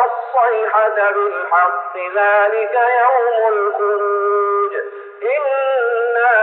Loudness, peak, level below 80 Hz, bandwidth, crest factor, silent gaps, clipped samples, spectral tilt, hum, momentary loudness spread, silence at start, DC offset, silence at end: -16 LUFS; -4 dBFS; -88 dBFS; 4.1 kHz; 12 dB; none; under 0.1%; 3 dB/octave; none; 7 LU; 0 s; under 0.1%; 0 s